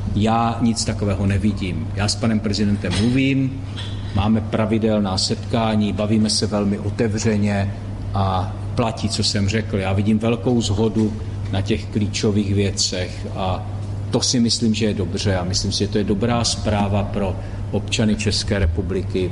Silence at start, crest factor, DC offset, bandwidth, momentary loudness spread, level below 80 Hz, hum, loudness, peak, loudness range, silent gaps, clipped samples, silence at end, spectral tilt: 0 s; 14 dB; under 0.1%; 11.5 kHz; 7 LU; -34 dBFS; none; -20 LUFS; -6 dBFS; 2 LU; none; under 0.1%; 0 s; -5 dB/octave